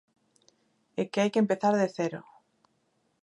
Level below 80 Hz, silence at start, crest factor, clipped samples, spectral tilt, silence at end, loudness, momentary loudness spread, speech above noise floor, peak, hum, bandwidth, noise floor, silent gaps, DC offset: -80 dBFS; 0.95 s; 18 dB; under 0.1%; -6 dB/octave; 1.05 s; -28 LUFS; 12 LU; 46 dB; -12 dBFS; none; 11 kHz; -73 dBFS; none; under 0.1%